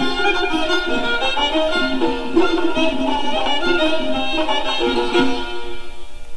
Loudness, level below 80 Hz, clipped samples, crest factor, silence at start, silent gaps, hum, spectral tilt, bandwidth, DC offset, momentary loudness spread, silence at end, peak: -19 LUFS; -34 dBFS; under 0.1%; 14 dB; 0 s; none; none; -3.5 dB/octave; 11 kHz; under 0.1%; 5 LU; 0 s; -2 dBFS